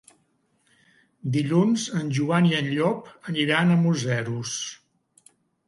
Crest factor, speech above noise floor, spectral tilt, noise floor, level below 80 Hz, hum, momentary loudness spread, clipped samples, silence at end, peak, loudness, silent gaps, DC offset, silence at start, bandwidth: 18 dB; 45 dB; -5.5 dB/octave; -68 dBFS; -66 dBFS; none; 11 LU; under 0.1%; 0.95 s; -8 dBFS; -24 LUFS; none; under 0.1%; 1.25 s; 11.5 kHz